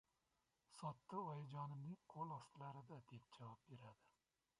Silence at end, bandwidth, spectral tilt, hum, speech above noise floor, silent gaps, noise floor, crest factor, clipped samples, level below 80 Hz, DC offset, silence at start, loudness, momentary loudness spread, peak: 0.5 s; 11 kHz; -7 dB/octave; none; 34 dB; none; -88 dBFS; 20 dB; under 0.1%; -88 dBFS; under 0.1%; 0.7 s; -55 LUFS; 12 LU; -36 dBFS